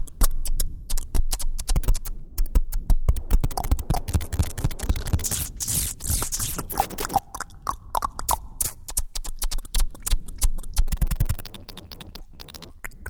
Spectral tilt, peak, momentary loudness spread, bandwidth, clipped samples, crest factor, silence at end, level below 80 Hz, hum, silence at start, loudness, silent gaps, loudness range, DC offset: -3.5 dB/octave; -4 dBFS; 13 LU; over 20 kHz; under 0.1%; 20 dB; 0 s; -26 dBFS; none; 0 s; -28 LUFS; none; 4 LU; under 0.1%